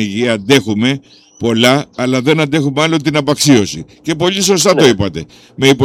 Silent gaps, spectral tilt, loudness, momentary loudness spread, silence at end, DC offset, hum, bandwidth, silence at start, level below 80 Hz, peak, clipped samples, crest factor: none; -4.5 dB/octave; -12 LUFS; 11 LU; 0 s; under 0.1%; none; 18 kHz; 0 s; -46 dBFS; 0 dBFS; under 0.1%; 12 dB